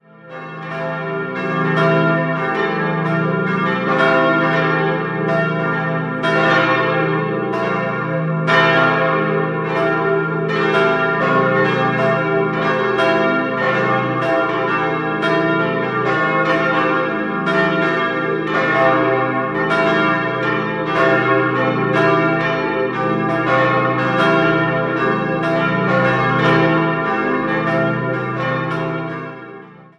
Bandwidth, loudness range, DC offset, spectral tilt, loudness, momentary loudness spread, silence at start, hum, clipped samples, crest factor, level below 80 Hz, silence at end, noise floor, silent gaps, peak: 9.6 kHz; 1 LU; under 0.1%; -7 dB/octave; -17 LUFS; 6 LU; 0.25 s; none; under 0.1%; 16 dB; -54 dBFS; 0.15 s; -38 dBFS; none; -2 dBFS